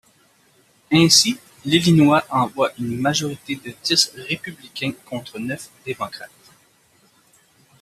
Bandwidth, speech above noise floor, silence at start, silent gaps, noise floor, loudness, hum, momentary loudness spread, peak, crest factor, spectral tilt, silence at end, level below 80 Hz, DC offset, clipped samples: 15 kHz; 38 dB; 0.9 s; none; -58 dBFS; -19 LUFS; none; 17 LU; 0 dBFS; 22 dB; -4 dB/octave; 1.55 s; -58 dBFS; under 0.1%; under 0.1%